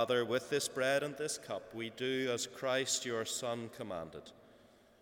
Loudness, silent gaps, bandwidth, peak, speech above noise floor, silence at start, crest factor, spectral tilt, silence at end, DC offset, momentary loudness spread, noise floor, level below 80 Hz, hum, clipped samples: -36 LUFS; none; 18.5 kHz; -20 dBFS; 27 dB; 0 s; 18 dB; -2.5 dB/octave; 0.45 s; under 0.1%; 11 LU; -63 dBFS; -76 dBFS; none; under 0.1%